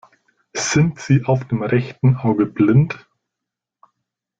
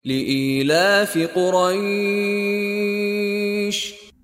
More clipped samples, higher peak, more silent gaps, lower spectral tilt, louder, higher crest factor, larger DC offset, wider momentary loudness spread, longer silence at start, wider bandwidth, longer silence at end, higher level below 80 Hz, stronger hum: neither; about the same, -4 dBFS vs -6 dBFS; neither; first, -6.5 dB/octave vs -4.5 dB/octave; about the same, -18 LUFS vs -20 LUFS; about the same, 16 dB vs 14 dB; neither; first, 9 LU vs 5 LU; first, 0.55 s vs 0.05 s; second, 7.8 kHz vs 16 kHz; first, 1.45 s vs 0.15 s; first, -52 dBFS vs -62 dBFS; neither